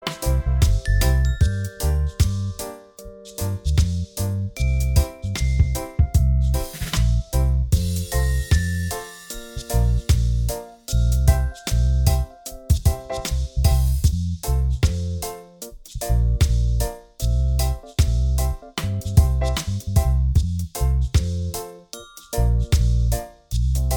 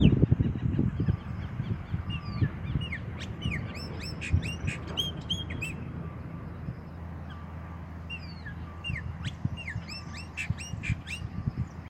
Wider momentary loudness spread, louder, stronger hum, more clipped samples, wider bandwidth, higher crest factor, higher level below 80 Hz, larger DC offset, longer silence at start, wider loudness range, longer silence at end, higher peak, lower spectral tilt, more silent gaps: about the same, 12 LU vs 12 LU; first, -22 LUFS vs -34 LUFS; neither; neither; first, over 20 kHz vs 14 kHz; second, 18 dB vs 26 dB; first, -22 dBFS vs -42 dBFS; neither; about the same, 0 s vs 0 s; second, 2 LU vs 7 LU; about the same, 0 s vs 0 s; first, -2 dBFS vs -6 dBFS; about the same, -5.5 dB/octave vs -6 dB/octave; neither